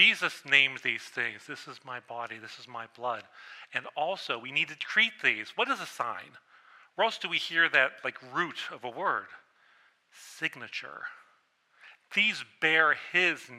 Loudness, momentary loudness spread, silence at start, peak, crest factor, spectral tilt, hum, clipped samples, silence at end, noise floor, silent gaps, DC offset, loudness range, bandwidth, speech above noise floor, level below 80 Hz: -28 LUFS; 19 LU; 0 s; -6 dBFS; 24 dB; -2 dB/octave; none; under 0.1%; 0 s; -68 dBFS; none; under 0.1%; 8 LU; 15.5 kHz; 37 dB; -88 dBFS